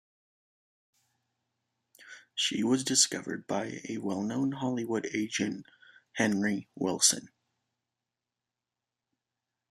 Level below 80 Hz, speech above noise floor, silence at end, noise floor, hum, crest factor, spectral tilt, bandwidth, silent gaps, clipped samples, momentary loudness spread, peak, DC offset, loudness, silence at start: -76 dBFS; 59 dB; 2.45 s; -89 dBFS; none; 26 dB; -2.5 dB/octave; 14.5 kHz; none; under 0.1%; 12 LU; -8 dBFS; under 0.1%; -30 LUFS; 2 s